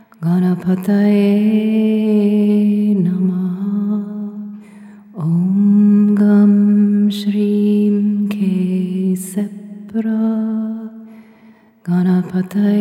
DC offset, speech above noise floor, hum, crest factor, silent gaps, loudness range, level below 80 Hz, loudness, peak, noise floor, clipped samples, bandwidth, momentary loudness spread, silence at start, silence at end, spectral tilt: under 0.1%; 33 dB; none; 12 dB; none; 7 LU; -68 dBFS; -15 LUFS; -4 dBFS; -46 dBFS; under 0.1%; 13 kHz; 14 LU; 0.2 s; 0 s; -8.5 dB/octave